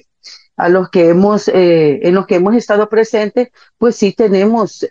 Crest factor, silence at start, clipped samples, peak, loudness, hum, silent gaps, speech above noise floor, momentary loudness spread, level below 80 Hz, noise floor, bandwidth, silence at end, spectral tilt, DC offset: 10 dB; 0.25 s; under 0.1%; -2 dBFS; -12 LUFS; none; none; 28 dB; 7 LU; -56 dBFS; -39 dBFS; 7.6 kHz; 0 s; -6.5 dB/octave; 0.1%